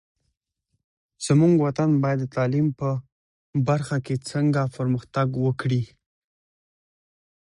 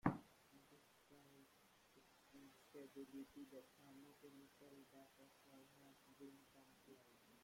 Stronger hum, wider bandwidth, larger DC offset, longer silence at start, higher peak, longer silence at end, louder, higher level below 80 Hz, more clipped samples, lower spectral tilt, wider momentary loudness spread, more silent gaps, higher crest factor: neither; second, 11 kHz vs 16.5 kHz; neither; first, 1.2 s vs 0.05 s; first, -8 dBFS vs -24 dBFS; first, 1.65 s vs 0 s; first, -23 LUFS vs -61 LUFS; first, -58 dBFS vs -86 dBFS; neither; about the same, -7.5 dB/octave vs -6.5 dB/octave; about the same, 9 LU vs 11 LU; first, 3.12-3.53 s vs none; second, 16 dB vs 34 dB